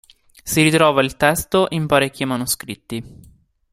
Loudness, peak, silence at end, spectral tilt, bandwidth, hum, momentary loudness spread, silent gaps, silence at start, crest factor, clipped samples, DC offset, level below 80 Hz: -17 LUFS; 0 dBFS; 0.6 s; -4 dB/octave; 16 kHz; none; 16 LU; none; 0.45 s; 20 dB; under 0.1%; under 0.1%; -46 dBFS